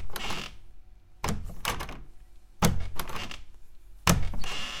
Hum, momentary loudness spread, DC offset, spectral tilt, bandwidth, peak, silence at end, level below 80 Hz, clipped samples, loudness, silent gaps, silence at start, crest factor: none; 15 LU; under 0.1%; -4 dB/octave; 17 kHz; -2 dBFS; 0 s; -38 dBFS; under 0.1%; -32 LUFS; none; 0 s; 28 dB